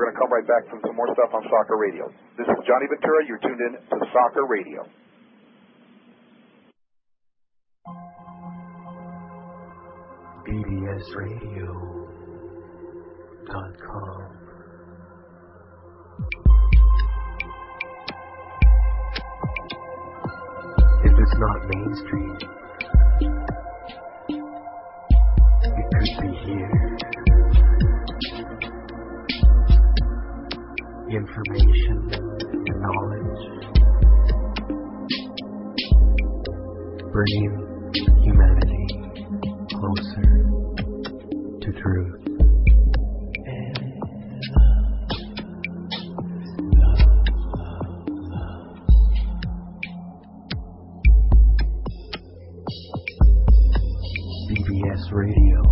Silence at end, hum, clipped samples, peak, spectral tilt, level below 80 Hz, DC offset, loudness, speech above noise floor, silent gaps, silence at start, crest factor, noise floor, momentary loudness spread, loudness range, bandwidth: 0 s; none; under 0.1%; -6 dBFS; -11.5 dB/octave; -20 dBFS; under 0.1%; -22 LUFS; 52 dB; none; 0 s; 14 dB; -72 dBFS; 20 LU; 13 LU; 5.8 kHz